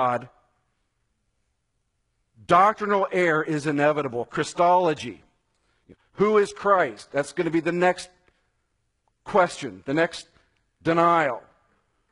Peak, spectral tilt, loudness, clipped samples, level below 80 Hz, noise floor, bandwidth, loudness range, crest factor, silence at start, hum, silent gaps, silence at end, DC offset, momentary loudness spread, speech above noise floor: -4 dBFS; -5.5 dB/octave; -23 LUFS; under 0.1%; -62 dBFS; -75 dBFS; 11 kHz; 4 LU; 20 dB; 0 s; none; none; 0.75 s; under 0.1%; 12 LU; 52 dB